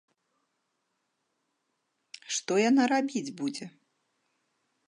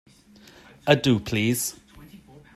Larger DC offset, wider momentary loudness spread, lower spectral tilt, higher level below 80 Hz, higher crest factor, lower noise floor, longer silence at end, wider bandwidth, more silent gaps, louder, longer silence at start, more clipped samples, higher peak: neither; first, 20 LU vs 10 LU; about the same, -3.5 dB/octave vs -4.5 dB/octave; second, -86 dBFS vs -54 dBFS; about the same, 20 dB vs 24 dB; first, -79 dBFS vs -52 dBFS; first, 1.2 s vs 0.4 s; second, 11 kHz vs 15 kHz; neither; second, -28 LUFS vs -23 LUFS; first, 2.3 s vs 0.85 s; neither; second, -12 dBFS vs -2 dBFS